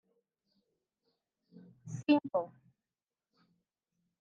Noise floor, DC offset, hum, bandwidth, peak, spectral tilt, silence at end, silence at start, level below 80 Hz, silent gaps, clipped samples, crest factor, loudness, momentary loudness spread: under -90 dBFS; under 0.1%; none; 7.4 kHz; -16 dBFS; -6.5 dB/octave; 1.75 s; 1.85 s; -86 dBFS; none; under 0.1%; 24 dB; -32 LUFS; 18 LU